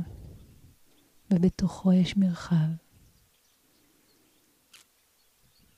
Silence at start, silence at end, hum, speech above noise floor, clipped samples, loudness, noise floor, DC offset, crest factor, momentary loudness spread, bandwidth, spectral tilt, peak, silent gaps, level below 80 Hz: 0 s; 3 s; none; 42 dB; under 0.1%; -26 LUFS; -66 dBFS; under 0.1%; 16 dB; 17 LU; 10.5 kHz; -7.5 dB/octave; -14 dBFS; none; -54 dBFS